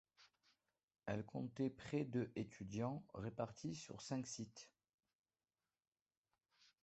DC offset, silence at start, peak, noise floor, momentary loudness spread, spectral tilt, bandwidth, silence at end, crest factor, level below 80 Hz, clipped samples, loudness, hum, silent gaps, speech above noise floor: under 0.1%; 0.2 s; -28 dBFS; under -90 dBFS; 9 LU; -6 dB/octave; 8.2 kHz; 0.2 s; 20 dB; -76 dBFS; under 0.1%; -47 LUFS; none; 0.83-0.88 s, 4.94-4.98 s, 5.15-5.24 s, 5.88-5.92 s, 6.02-6.06 s, 6.17-6.24 s; over 44 dB